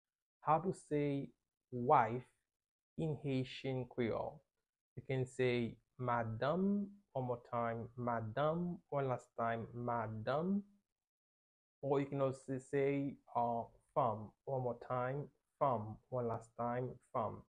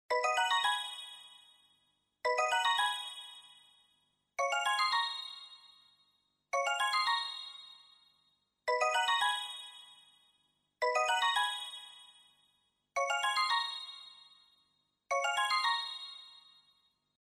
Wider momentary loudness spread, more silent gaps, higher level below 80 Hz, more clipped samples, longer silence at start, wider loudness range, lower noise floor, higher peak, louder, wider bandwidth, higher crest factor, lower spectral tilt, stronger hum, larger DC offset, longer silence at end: second, 8 LU vs 20 LU; first, 2.56-2.60 s, 2.71-2.96 s, 4.81-4.96 s, 10.92-10.96 s, 11.09-11.82 s vs none; first, -70 dBFS vs -86 dBFS; neither; first, 0.45 s vs 0.1 s; about the same, 2 LU vs 3 LU; first, under -90 dBFS vs -77 dBFS; about the same, -18 dBFS vs -20 dBFS; second, -40 LUFS vs -32 LUFS; second, 10.5 kHz vs 14.5 kHz; about the same, 22 dB vs 18 dB; first, -8 dB/octave vs 3 dB/octave; second, none vs 50 Hz at -90 dBFS; neither; second, 0.1 s vs 0.85 s